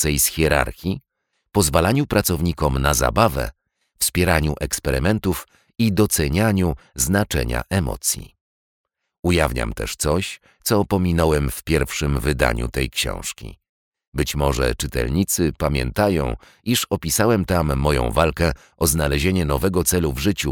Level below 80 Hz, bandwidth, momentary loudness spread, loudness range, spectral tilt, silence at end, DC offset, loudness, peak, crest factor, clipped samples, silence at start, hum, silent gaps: -30 dBFS; 20 kHz; 8 LU; 3 LU; -4.5 dB/octave; 0 s; under 0.1%; -20 LUFS; -2 dBFS; 18 dB; under 0.1%; 0 s; none; 8.41-8.84 s, 9.19-9.23 s, 13.69-13.92 s, 14.07-14.12 s